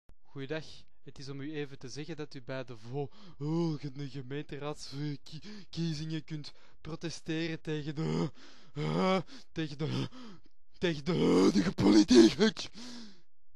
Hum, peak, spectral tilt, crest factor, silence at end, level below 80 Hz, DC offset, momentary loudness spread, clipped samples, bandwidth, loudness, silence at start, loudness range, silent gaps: none; -10 dBFS; -6 dB/octave; 22 dB; 0.05 s; -58 dBFS; 0.6%; 21 LU; under 0.1%; 11.5 kHz; -32 LUFS; 0.35 s; 13 LU; none